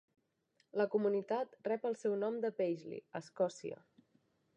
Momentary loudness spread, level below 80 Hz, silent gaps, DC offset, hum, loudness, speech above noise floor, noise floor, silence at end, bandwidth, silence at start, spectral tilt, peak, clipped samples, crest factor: 13 LU; under -90 dBFS; none; under 0.1%; none; -38 LUFS; 41 dB; -78 dBFS; 0.8 s; 9.4 kHz; 0.75 s; -6.5 dB/octave; -20 dBFS; under 0.1%; 18 dB